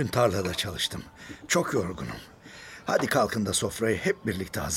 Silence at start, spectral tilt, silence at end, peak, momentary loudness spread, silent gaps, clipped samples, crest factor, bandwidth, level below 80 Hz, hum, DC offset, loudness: 0 s; -4 dB/octave; 0 s; -10 dBFS; 18 LU; none; under 0.1%; 20 dB; 16.5 kHz; -52 dBFS; none; under 0.1%; -27 LUFS